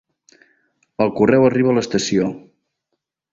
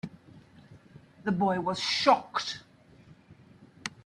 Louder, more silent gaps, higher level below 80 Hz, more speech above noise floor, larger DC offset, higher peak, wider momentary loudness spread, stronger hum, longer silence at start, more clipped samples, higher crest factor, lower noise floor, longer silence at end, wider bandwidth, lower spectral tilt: first, -17 LUFS vs -28 LUFS; neither; first, -56 dBFS vs -70 dBFS; first, 60 dB vs 29 dB; neither; first, -2 dBFS vs -8 dBFS; about the same, 15 LU vs 17 LU; neither; first, 1 s vs 0.05 s; neither; second, 18 dB vs 24 dB; first, -76 dBFS vs -56 dBFS; first, 0.95 s vs 0.15 s; second, 7.8 kHz vs 11.5 kHz; first, -5.5 dB/octave vs -4 dB/octave